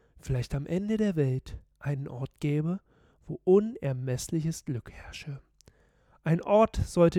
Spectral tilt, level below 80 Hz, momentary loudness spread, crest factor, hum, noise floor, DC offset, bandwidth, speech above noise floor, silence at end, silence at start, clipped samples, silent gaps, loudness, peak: -7 dB/octave; -48 dBFS; 17 LU; 20 dB; none; -64 dBFS; under 0.1%; 15.5 kHz; 36 dB; 0 s; 0.25 s; under 0.1%; none; -29 LUFS; -10 dBFS